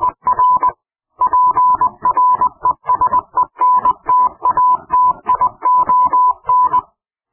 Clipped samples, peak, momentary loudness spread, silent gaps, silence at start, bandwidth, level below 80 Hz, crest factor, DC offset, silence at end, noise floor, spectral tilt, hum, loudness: under 0.1%; -6 dBFS; 4 LU; none; 0 s; 3.2 kHz; -48 dBFS; 8 dB; under 0.1%; 0.5 s; -52 dBFS; -9.5 dB/octave; none; -14 LUFS